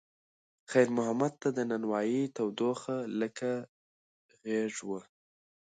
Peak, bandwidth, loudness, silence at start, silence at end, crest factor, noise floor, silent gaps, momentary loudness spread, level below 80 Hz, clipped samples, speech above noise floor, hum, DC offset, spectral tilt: -12 dBFS; 9.4 kHz; -32 LUFS; 0.7 s; 0.75 s; 22 dB; under -90 dBFS; 3.69-4.29 s; 11 LU; -82 dBFS; under 0.1%; over 59 dB; none; under 0.1%; -5.5 dB/octave